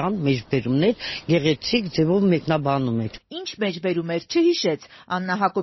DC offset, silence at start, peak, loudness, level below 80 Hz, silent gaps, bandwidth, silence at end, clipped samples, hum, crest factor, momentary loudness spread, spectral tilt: under 0.1%; 0 s; -6 dBFS; -22 LUFS; -54 dBFS; none; 6.2 kHz; 0 s; under 0.1%; none; 16 dB; 9 LU; -5 dB/octave